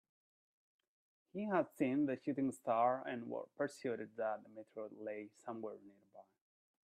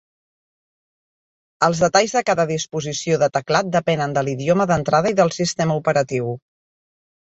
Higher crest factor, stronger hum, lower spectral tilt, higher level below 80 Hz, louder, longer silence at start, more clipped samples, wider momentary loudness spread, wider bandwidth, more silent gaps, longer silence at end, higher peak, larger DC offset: about the same, 20 dB vs 18 dB; neither; first, -7 dB/octave vs -4.5 dB/octave; second, -88 dBFS vs -54 dBFS; second, -41 LUFS vs -19 LUFS; second, 1.35 s vs 1.6 s; neither; first, 14 LU vs 8 LU; first, 13.5 kHz vs 8.2 kHz; neither; second, 0.65 s vs 0.85 s; second, -22 dBFS vs -2 dBFS; neither